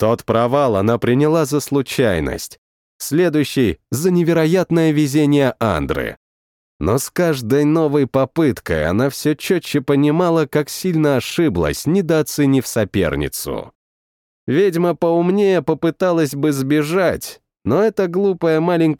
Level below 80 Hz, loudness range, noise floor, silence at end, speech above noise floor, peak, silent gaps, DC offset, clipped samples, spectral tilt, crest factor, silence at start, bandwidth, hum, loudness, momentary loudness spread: -42 dBFS; 2 LU; under -90 dBFS; 0.05 s; over 74 dB; -4 dBFS; 2.58-2.99 s, 6.17-6.80 s, 13.75-14.47 s; under 0.1%; under 0.1%; -6 dB/octave; 14 dB; 0 s; 18 kHz; none; -17 LUFS; 6 LU